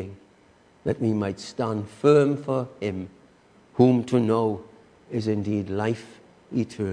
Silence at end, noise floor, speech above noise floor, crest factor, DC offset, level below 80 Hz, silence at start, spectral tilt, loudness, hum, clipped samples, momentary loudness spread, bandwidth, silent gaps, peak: 0 s; -57 dBFS; 33 dB; 20 dB; under 0.1%; -62 dBFS; 0 s; -7.5 dB/octave; -25 LUFS; none; under 0.1%; 14 LU; 10 kHz; none; -4 dBFS